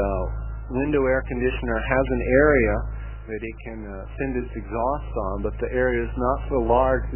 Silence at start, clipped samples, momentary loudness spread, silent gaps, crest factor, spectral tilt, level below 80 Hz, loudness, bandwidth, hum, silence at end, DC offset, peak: 0 s; under 0.1%; 15 LU; none; 18 dB; -11 dB/octave; -30 dBFS; -24 LUFS; 3.2 kHz; none; 0 s; 0.2%; -6 dBFS